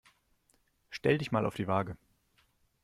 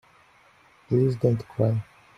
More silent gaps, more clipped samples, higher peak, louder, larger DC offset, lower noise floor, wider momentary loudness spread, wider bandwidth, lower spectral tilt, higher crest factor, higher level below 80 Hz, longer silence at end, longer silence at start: neither; neither; second, -12 dBFS vs -8 dBFS; second, -32 LUFS vs -25 LUFS; neither; first, -72 dBFS vs -57 dBFS; first, 15 LU vs 4 LU; first, 15 kHz vs 7.2 kHz; second, -7 dB/octave vs -10 dB/octave; about the same, 22 dB vs 18 dB; second, -64 dBFS vs -58 dBFS; first, 0.9 s vs 0.35 s; about the same, 0.9 s vs 0.9 s